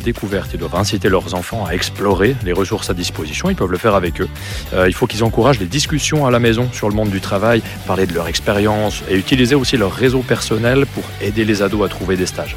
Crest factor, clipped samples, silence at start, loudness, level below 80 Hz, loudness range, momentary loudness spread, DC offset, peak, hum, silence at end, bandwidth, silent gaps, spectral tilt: 14 dB; under 0.1%; 0 s; -16 LUFS; -32 dBFS; 2 LU; 7 LU; under 0.1%; -2 dBFS; none; 0 s; 19.5 kHz; none; -5 dB/octave